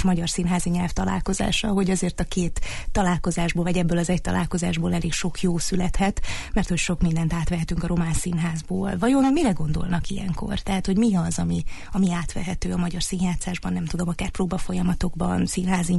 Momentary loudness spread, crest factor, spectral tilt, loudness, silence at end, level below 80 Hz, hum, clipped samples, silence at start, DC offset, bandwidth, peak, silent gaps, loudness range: 6 LU; 14 dB; -5.5 dB/octave; -24 LUFS; 0 s; -32 dBFS; none; under 0.1%; 0 s; under 0.1%; 11.5 kHz; -10 dBFS; none; 2 LU